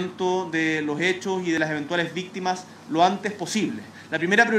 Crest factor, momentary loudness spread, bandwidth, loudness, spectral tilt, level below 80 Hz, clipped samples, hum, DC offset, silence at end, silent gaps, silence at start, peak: 20 dB; 8 LU; 14 kHz; -24 LUFS; -4.5 dB/octave; -70 dBFS; under 0.1%; none; under 0.1%; 0 s; none; 0 s; -4 dBFS